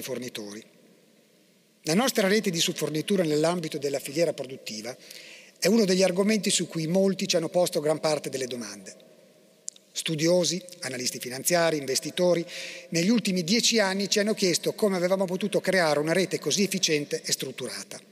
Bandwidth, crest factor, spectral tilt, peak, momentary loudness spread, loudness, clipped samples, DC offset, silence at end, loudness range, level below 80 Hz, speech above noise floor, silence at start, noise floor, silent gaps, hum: 16 kHz; 16 dB; -3.5 dB/octave; -10 dBFS; 14 LU; -25 LUFS; under 0.1%; under 0.1%; 0.1 s; 4 LU; -78 dBFS; 35 dB; 0 s; -61 dBFS; none; none